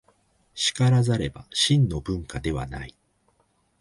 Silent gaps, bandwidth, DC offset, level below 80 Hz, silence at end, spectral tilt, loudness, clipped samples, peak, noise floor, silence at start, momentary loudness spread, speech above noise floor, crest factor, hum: none; 11.5 kHz; under 0.1%; -44 dBFS; 0.9 s; -5 dB/octave; -24 LUFS; under 0.1%; -8 dBFS; -67 dBFS; 0.55 s; 16 LU; 44 dB; 18 dB; none